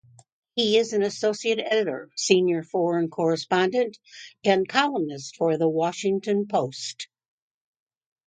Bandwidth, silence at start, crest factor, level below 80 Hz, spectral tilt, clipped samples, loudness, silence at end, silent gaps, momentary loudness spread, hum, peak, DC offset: 9.4 kHz; 0.55 s; 24 dB; -74 dBFS; -4 dB/octave; under 0.1%; -24 LUFS; 1.2 s; none; 11 LU; none; -2 dBFS; under 0.1%